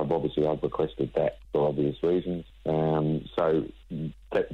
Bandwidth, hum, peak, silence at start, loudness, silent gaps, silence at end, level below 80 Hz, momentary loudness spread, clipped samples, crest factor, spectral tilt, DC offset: 6 kHz; none; -14 dBFS; 0 s; -28 LUFS; none; 0 s; -50 dBFS; 9 LU; under 0.1%; 14 dB; -9.5 dB/octave; under 0.1%